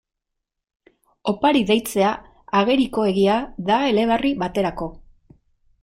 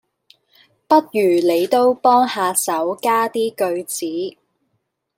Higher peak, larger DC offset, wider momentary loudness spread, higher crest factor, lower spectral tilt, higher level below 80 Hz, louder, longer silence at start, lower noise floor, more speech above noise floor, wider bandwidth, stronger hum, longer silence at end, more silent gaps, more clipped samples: second, -6 dBFS vs -2 dBFS; neither; about the same, 9 LU vs 9 LU; about the same, 16 dB vs 16 dB; first, -5.5 dB/octave vs -3.5 dB/octave; first, -48 dBFS vs -72 dBFS; second, -20 LUFS vs -17 LUFS; first, 1.25 s vs 0.9 s; first, -81 dBFS vs -71 dBFS; first, 62 dB vs 54 dB; about the same, 16 kHz vs 16.5 kHz; neither; about the same, 0.85 s vs 0.9 s; neither; neither